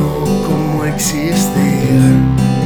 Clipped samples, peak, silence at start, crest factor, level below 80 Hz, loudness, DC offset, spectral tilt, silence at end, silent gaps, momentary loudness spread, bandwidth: under 0.1%; 0 dBFS; 0 s; 12 dB; -30 dBFS; -13 LUFS; 2%; -6 dB/octave; 0 s; none; 5 LU; 19.5 kHz